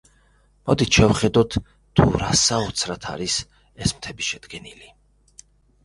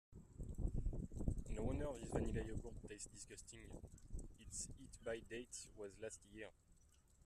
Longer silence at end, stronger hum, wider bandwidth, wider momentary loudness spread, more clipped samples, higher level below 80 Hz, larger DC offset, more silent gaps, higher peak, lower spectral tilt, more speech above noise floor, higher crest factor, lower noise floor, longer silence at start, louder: first, 1 s vs 0 s; first, 50 Hz at -45 dBFS vs none; second, 11.5 kHz vs 13.5 kHz; first, 16 LU vs 12 LU; neither; first, -38 dBFS vs -52 dBFS; neither; neither; first, 0 dBFS vs -26 dBFS; second, -4 dB/octave vs -5.5 dB/octave; first, 37 dB vs 21 dB; about the same, 22 dB vs 22 dB; second, -58 dBFS vs -71 dBFS; first, 0.65 s vs 0.1 s; first, -21 LUFS vs -50 LUFS